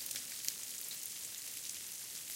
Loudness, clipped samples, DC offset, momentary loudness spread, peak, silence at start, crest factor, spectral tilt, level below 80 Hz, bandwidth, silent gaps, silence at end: -41 LUFS; under 0.1%; under 0.1%; 3 LU; -12 dBFS; 0 s; 32 dB; 1.5 dB/octave; -82 dBFS; 17 kHz; none; 0 s